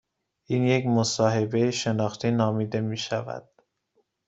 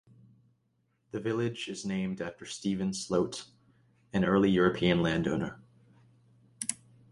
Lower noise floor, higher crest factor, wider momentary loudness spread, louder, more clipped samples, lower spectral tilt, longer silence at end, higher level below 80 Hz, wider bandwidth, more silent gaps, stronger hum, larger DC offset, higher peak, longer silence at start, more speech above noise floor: about the same, -72 dBFS vs -75 dBFS; about the same, 18 dB vs 20 dB; second, 8 LU vs 13 LU; first, -25 LUFS vs -31 LUFS; neither; about the same, -5.5 dB/octave vs -5.5 dB/octave; first, 0.85 s vs 0.35 s; second, -64 dBFS vs -58 dBFS; second, 8 kHz vs 11.5 kHz; neither; neither; neither; first, -8 dBFS vs -12 dBFS; second, 0.5 s vs 1.15 s; about the same, 47 dB vs 45 dB